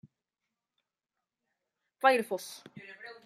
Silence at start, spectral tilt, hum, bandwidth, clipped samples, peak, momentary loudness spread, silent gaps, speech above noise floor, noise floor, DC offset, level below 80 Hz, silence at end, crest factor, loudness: 2.05 s; -3 dB/octave; none; 15.5 kHz; under 0.1%; -12 dBFS; 21 LU; none; 58 dB; -89 dBFS; under 0.1%; -88 dBFS; 0.15 s; 24 dB; -29 LUFS